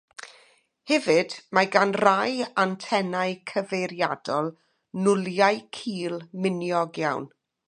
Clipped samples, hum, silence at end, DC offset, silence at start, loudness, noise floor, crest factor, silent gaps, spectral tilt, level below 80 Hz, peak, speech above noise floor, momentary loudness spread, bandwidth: under 0.1%; none; 0.4 s; under 0.1%; 0.2 s; -25 LUFS; -60 dBFS; 24 dB; none; -5 dB/octave; -76 dBFS; -2 dBFS; 35 dB; 12 LU; 10.5 kHz